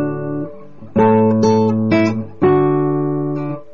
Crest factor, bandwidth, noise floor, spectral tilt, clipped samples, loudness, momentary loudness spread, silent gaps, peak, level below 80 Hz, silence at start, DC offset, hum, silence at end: 10 dB; 7 kHz; -36 dBFS; -7.5 dB/octave; under 0.1%; -16 LUFS; 11 LU; none; -4 dBFS; -52 dBFS; 0 s; 2%; none; 0.1 s